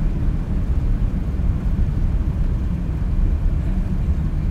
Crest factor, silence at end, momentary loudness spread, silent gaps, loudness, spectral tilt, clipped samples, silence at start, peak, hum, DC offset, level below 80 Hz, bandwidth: 12 dB; 0 s; 2 LU; none; -23 LUFS; -9.5 dB/octave; under 0.1%; 0 s; -8 dBFS; none; under 0.1%; -20 dBFS; 4.5 kHz